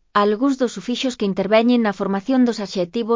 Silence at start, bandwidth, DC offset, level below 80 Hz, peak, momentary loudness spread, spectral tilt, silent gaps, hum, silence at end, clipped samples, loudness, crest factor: 0.15 s; 7.6 kHz; under 0.1%; -60 dBFS; -4 dBFS; 7 LU; -5.5 dB/octave; none; none; 0 s; under 0.1%; -19 LUFS; 16 dB